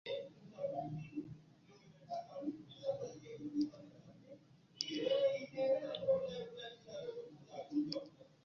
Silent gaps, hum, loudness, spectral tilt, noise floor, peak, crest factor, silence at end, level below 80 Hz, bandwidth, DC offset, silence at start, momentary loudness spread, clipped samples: none; none; -42 LUFS; -4.5 dB/octave; -64 dBFS; -18 dBFS; 24 dB; 0.2 s; -78 dBFS; 7.2 kHz; under 0.1%; 0.05 s; 21 LU; under 0.1%